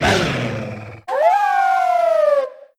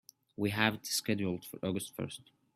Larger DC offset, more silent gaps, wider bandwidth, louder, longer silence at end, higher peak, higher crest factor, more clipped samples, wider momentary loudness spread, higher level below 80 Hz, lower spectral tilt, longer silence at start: neither; neither; about the same, 15.5 kHz vs 16 kHz; first, -17 LUFS vs -35 LUFS; second, 0.15 s vs 0.35 s; first, -4 dBFS vs -10 dBFS; second, 14 dB vs 26 dB; neither; about the same, 12 LU vs 13 LU; first, -44 dBFS vs -70 dBFS; about the same, -5 dB/octave vs -4 dB/octave; second, 0 s vs 0.4 s